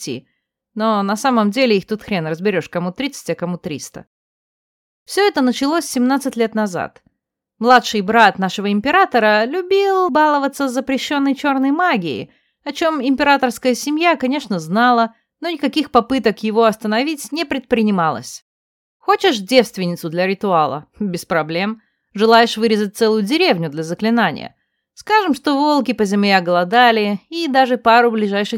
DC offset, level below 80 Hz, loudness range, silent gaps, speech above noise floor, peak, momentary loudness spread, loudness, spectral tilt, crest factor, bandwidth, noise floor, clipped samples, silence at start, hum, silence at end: under 0.1%; -58 dBFS; 5 LU; 4.07-5.06 s, 18.42-19.00 s; 60 dB; 0 dBFS; 12 LU; -16 LUFS; -4.5 dB/octave; 16 dB; 17 kHz; -76 dBFS; under 0.1%; 0 s; none; 0 s